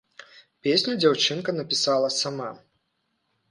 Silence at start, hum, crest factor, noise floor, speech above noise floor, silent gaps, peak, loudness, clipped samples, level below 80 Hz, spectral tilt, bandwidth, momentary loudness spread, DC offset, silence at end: 0.2 s; none; 20 dB; -75 dBFS; 51 dB; none; -6 dBFS; -23 LUFS; under 0.1%; -72 dBFS; -3.5 dB/octave; 11.5 kHz; 10 LU; under 0.1%; 0.95 s